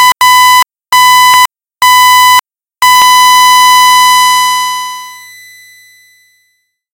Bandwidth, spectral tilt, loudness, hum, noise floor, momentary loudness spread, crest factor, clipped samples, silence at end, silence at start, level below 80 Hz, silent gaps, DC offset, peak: over 20 kHz; 2.5 dB/octave; -4 LUFS; none; -59 dBFS; 9 LU; 8 dB; 4%; 1.75 s; 0 s; -56 dBFS; none; under 0.1%; 0 dBFS